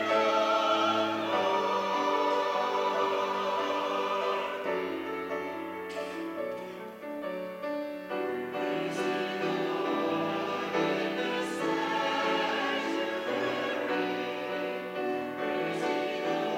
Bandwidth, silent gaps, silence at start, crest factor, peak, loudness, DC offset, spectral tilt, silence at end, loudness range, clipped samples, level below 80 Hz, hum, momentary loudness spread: 16 kHz; none; 0 s; 16 dB; -14 dBFS; -30 LUFS; under 0.1%; -4.5 dB/octave; 0 s; 7 LU; under 0.1%; -78 dBFS; none; 9 LU